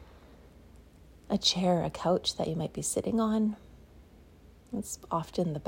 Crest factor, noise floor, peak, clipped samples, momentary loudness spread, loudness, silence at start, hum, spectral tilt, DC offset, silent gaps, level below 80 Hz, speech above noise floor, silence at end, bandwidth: 20 dB; -56 dBFS; -14 dBFS; under 0.1%; 11 LU; -30 LUFS; 0 s; none; -4.5 dB/octave; under 0.1%; none; -56 dBFS; 26 dB; 0 s; 16 kHz